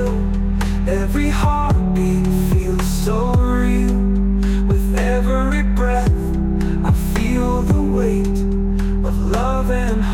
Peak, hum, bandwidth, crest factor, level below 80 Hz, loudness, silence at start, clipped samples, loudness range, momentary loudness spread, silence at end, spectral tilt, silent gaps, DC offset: -6 dBFS; none; 16.5 kHz; 10 dB; -20 dBFS; -18 LUFS; 0 s; under 0.1%; 1 LU; 3 LU; 0 s; -7 dB/octave; none; under 0.1%